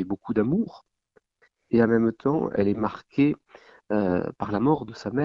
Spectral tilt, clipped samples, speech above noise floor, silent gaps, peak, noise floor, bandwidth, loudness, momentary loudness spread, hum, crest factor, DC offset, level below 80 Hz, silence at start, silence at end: -9 dB/octave; under 0.1%; 42 dB; none; -8 dBFS; -67 dBFS; 7.2 kHz; -25 LUFS; 8 LU; none; 18 dB; under 0.1%; -56 dBFS; 0 s; 0 s